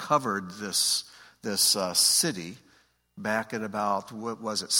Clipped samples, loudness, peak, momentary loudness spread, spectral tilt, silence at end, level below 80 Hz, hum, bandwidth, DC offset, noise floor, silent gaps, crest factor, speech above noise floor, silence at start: under 0.1%; -26 LUFS; -8 dBFS; 15 LU; -1.5 dB/octave; 0 s; -72 dBFS; none; 17 kHz; under 0.1%; -63 dBFS; none; 20 dB; 36 dB; 0 s